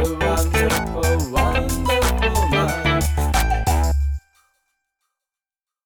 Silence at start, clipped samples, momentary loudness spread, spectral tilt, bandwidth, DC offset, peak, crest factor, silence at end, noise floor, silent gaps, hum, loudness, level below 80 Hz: 0 s; under 0.1%; 3 LU; -5 dB/octave; over 20 kHz; under 0.1%; -4 dBFS; 16 dB; 1.65 s; -90 dBFS; none; none; -20 LUFS; -24 dBFS